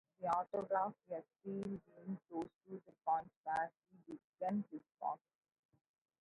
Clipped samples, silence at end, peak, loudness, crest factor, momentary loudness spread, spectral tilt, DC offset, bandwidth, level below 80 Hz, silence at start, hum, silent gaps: under 0.1%; 1.05 s; -24 dBFS; -43 LUFS; 20 dB; 13 LU; -6.5 dB/octave; under 0.1%; 7.4 kHz; -82 dBFS; 0.2 s; none; 2.56-2.61 s, 3.36-3.44 s, 4.24-4.33 s